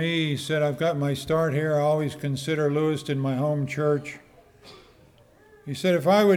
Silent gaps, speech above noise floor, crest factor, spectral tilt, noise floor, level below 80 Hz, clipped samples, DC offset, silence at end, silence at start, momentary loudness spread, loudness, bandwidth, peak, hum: none; 32 dB; 16 dB; -6.5 dB/octave; -55 dBFS; -60 dBFS; under 0.1%; under 0.1%; 0 s; 0 s; 6 LU; -25 LUFS; 16.5 kHz; -8 dBFS; none